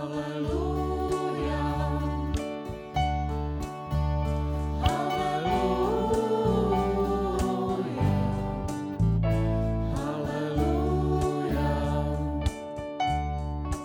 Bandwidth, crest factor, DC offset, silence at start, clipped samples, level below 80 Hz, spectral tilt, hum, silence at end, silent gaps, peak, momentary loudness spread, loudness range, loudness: 17.5 kHz; 16 dB; under 0.1%; 0 s; under 0.1%; -34 dBFS; -7 dB/octave; none; 0 s; none; -10 dBFS; 7 LU; 3 LU; -28 LUFS